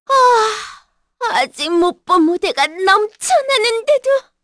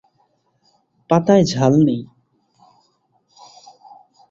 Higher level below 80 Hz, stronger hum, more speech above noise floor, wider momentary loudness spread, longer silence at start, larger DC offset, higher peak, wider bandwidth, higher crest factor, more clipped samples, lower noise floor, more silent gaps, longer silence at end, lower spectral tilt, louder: about the same, -56 dBFS vs -56 dBFS; neither; second, 30 dB vs 49 dB; about the same, 7 LU vs 5 LU; second, 0.1 s vs 1.1 s; neither; about the same, -2 dBFS vs -2 dBFS; first, 11 kHz vs 7.8 kHz; second, 14 dB vs 20 dB; neither; second, -45 dBFS vs -64 dBFS; neither; second, 0.25 s vs 2.25 s; second, -1 dB/octave vs -7 dB/octave; about the same, -15 LUFS vs -16 LUFS